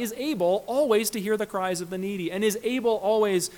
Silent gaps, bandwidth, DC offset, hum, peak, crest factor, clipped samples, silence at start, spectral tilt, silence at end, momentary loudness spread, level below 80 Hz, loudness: none; 19 kHz; under 0.1%; none; -10 dBFS; 16 dB; under 0.1%; 0 s; -4 dB/octave; 0 s; 7 LU; -64 dBFS; -25 LUFS